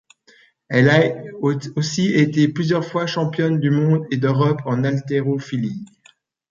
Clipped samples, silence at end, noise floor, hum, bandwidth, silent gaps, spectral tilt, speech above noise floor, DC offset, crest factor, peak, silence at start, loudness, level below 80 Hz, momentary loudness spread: under 0.1%; 0.65 s; -55 dBFS; none; 7.4 kHz; none; -6.5 dB/octave; 37 dB; under 0.1%; 18 dB; -2 dBFS; 0.7 s; -19 LUFS; -60 dBFS; 8 LU